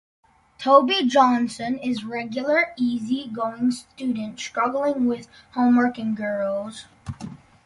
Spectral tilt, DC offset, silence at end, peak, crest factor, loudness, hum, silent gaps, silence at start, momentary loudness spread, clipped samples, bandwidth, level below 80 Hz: -5 dB/octave; under 0.1%; 0.3 s; -2 dBFS; 20 dB; -22 LUFS; none; none; 0.6 s; 16 LU; under 0.1%; 11.5 kHz; -58 dBFS